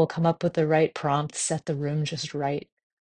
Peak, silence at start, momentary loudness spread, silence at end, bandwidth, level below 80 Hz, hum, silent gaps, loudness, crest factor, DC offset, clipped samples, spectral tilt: -8 dBFS; 0 s; 7 LU; 0.5 s; 10 kHz; -64 dBFS; none; none; -26 LUFS; 18 dB; under 0.1%; under 0.1%; -5 dB/octave